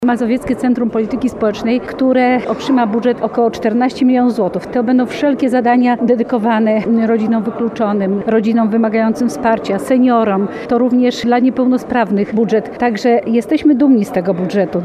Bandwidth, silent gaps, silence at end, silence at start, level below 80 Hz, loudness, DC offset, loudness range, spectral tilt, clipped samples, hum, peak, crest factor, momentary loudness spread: 12 kHz; none; 0 s; 0 s; -48 dBFS; -14 LUFS; under 0.1%; 1 LU; -7 dB/octave; under 0.1%; none; 0 dBFS; 12 dB; 5 LU